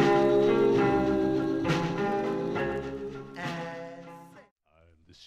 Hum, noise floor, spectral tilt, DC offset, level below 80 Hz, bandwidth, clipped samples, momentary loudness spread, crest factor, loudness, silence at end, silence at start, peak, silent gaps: none; -62 dBFS; -7 dB/octave; under 0.1%; -54 dBFS; 10.5 kHz; under 0.1%; 16 LU; 14 dB; -27 LUFS; 0 s; 0 s; -12 dBFS; 4.51-4.56 s